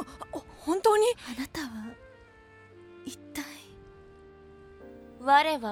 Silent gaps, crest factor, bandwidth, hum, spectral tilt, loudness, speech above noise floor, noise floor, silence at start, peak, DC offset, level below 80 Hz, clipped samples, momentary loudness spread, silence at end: none; 22 dB; 17 kHz; none; -3 dB/octave; -28 LUFS; 29 dB; -54 dBFS; 0 s; -10 dBFS; under 0.1%; -60 dBFS; under 0.1%; 25 LU; 0 s